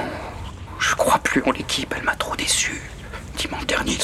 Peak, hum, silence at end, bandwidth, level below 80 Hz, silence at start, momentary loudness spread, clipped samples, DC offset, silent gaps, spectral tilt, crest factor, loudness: -6 dBFS; none; 0 s; 16 kHz; -38 dBFS; 0 s; 16 LU; under 0.1%; under 0.1%; none; -2.5 dB/octave; 18 dB; -22 LUFS